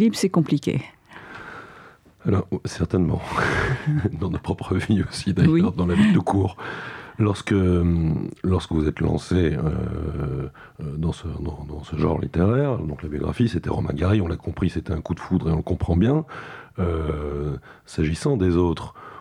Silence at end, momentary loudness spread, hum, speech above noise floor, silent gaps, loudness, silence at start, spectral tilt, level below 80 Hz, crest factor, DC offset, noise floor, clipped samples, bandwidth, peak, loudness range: 0 s; 13 LU; none; 26 dB; none; -23 LUFS; 0 s; -7.5 dB/octave; -40 dBFS; 18 dB; under 0.1%; -48 dBFS; under 0.1%; 13 kHz; -6 dBFS; 5 LU